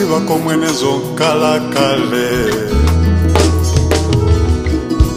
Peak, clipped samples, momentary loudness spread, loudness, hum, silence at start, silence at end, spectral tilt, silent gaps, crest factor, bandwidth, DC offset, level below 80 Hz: 0 dBFS; under 0.1%; 3 LU; -14 LUFS; none; 0 s; 0 s; -5.5 dB/octave; none; 12 dB; 15.5 kHz; under 0.1%; -20 dBFS